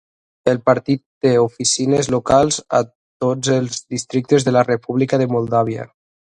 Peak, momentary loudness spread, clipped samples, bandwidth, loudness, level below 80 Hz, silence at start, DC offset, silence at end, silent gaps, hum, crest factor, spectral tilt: 0 dBFS; 8 LU; under 0.1%; 11 kHz; -18 LUFS; -50 dBFS; 0.45 s; under 0.1%; 0.45 s; 1.06-1.21 s, 2.95-3.20 s; none; 18 dB; -5 dB/octave